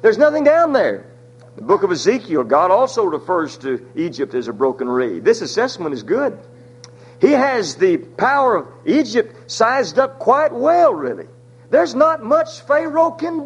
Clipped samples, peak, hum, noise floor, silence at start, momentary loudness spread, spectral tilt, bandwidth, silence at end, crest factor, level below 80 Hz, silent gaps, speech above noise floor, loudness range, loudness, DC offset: under 0.1%; 0 dBFS; none; -41 dBFS; 0.05 s; 10 LU; -5 dB/octave; 10.5 kHz; 0 s; 16 dB; -62 dBFS; none; 25 dB; 4 LU; -17 LUFS; under 0.1%